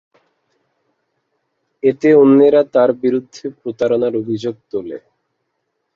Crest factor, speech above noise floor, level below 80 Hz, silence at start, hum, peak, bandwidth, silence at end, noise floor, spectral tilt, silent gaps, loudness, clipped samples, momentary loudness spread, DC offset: 16 dB; 58 dB; -62 dBFS; 1.85 s; none; -2 dBFS; 7.2 kHz; 1 s; -72 dBFS; -7.5 dB/octave; none; -15 LUFS; under 0.1%; 18 LU; under 0.1%